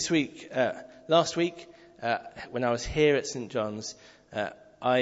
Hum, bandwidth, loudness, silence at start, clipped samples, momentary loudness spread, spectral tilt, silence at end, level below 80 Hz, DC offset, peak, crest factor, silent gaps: none; 8 kHz; -29 LUFS; 0 s; under 0.1%; 14 LU; -4 dB/octave; 0 s; -52 dBFS; under 0.1%; -10 dBFS; 20 dB; none